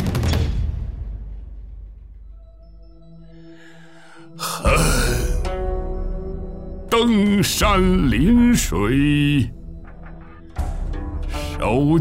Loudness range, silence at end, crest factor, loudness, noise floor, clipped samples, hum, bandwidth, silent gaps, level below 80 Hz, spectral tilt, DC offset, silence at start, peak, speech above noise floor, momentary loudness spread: 15 LU; 0 s; 16 dB; -20 LUFS; -45 dBFS; under 0.1%; none; 16 kHz; none; -26 dBFS; -5.5 dB/octave; 0.5%; 0 s; -4 dBFS; 29 dB; 23 LU